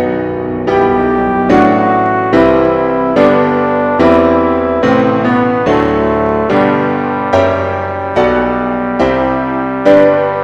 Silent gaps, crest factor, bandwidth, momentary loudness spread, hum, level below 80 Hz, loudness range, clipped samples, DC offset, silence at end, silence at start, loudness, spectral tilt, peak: none; 10 dB; 8 kHz; 7 LU; none; -34 dBFS; 3 LU; 0.4%; 0.3%; 0 s; 0 s; -11 LUFS; -7.5 dB/octave; 0 dBFS